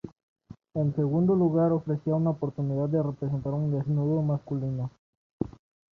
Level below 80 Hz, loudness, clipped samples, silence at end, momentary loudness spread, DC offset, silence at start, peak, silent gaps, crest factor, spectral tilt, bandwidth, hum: -58 dBFS; -28 LUFS; under 0.1%; 0.45 s; 13 LU; under 0.1%; 0.05 s; -12 dBFS; 0.23-0.36 s, 4.98-5.39 s; 16 dB; -12 dB/octave; 2.2 kHz; none